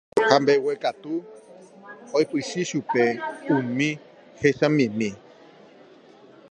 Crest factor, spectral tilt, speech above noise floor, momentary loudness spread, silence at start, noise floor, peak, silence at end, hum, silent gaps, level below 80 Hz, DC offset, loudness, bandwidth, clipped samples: 24 dB; -5.5 dB/octave; 27 dB; 13 LU; 0.15 s; -50 dBFS; 0 dBFS; 1.35 s; none; none; -66 dBFS; under 0.1%; -23 LUFS; 10 kHz; under 0.1%